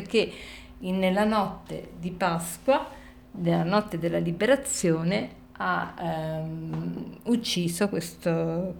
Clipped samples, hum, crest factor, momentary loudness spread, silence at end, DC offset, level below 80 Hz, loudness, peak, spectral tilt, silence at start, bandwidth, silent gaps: under 0.1%; none; 18 dB; 13 LU; 0 s; under 0.1%; -54 dBFS; -27 LUFS; -10 dBFS; -5 dB/octave; 0 s; 19.5 kHz; none